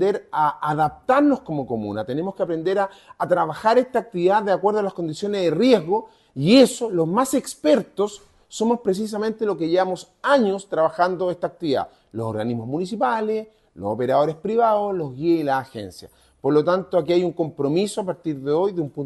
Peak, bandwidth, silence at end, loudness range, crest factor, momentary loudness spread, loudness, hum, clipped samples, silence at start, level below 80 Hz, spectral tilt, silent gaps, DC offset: -2 dBFS; 12.5 kHz; 0 s; 4 LU; 20 dB; 9 LU; -22 LUFS; none; under 0.1%; 0 s; -60 dBFS; -5.5 dB/octave; none; under 0.1%